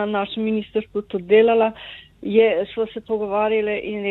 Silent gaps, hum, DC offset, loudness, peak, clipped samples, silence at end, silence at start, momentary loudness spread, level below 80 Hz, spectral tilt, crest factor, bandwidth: none; none; under 0.1%; -20 LUFS; -4 dBFS; under 0.1%; 0 s; 0 s; 11 LU; -56 dBFS; -8 dB/octave; 16 dB; 4.1 kHz